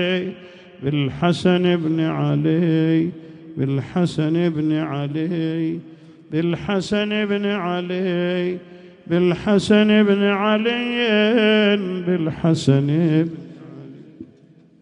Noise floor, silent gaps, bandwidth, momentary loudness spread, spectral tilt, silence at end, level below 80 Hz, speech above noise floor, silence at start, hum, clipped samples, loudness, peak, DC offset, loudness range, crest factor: -50 dBFS; none; 10.5 kHz; 11 LU; -7 dB/octave; 0.55 s; -56 dBFS; 31 dB; 0 s; none; under 0.1%; -19 LUFS; -2 dBFS; under 0.1%; 6 LU; 18 dB